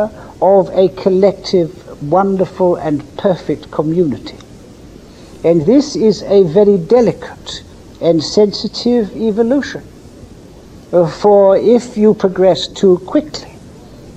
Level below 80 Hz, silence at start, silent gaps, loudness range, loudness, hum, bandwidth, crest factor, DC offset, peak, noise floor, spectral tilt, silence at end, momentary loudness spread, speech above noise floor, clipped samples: -44 dBFS; 0 s; none; 4 LU; -13 LUFS; none; 9.2 kHz; 14 dB; under 0.1%; 0 dBFS; -37 dBFS; -6.5 dB/octave; 0.05 s; 13 LU; 24 dB; under 0.1%